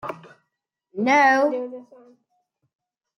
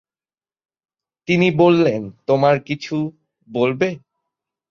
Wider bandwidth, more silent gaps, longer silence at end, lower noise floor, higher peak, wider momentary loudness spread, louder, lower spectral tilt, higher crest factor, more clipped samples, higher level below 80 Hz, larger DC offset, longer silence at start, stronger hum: first, 11 kHz vs 7 kHz; neither; first, 1.35 s vs 0.7 s; second, -79 dBFS vs under -90 dBFS; second, -6 dBFS vs -2 dBFS; first, 24 LU vs 15 LU; about the same, -19 LUFS vs -18 LUFS; second, -4.5 dB/octave vs -7 dB/octave; about the same, 18 dB vs 18 dB; neither; second, -74 dBFS vs -60 dBFS; neither; second, 0.05 s vs 1.3 s; neither